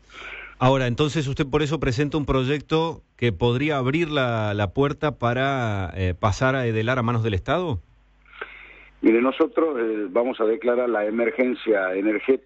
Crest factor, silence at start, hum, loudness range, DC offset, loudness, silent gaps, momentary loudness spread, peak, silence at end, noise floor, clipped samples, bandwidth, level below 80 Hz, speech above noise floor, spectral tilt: 14 dB; 0.15 s; none; 2 LU; under 0.1%; -23 LUFS; none; 6 LU; -8 dBFS; 0.1 s; -52 dBFS; under 0.1%; 8.2 kHz; -44 dBFS; 30 dB; -7 dB/octave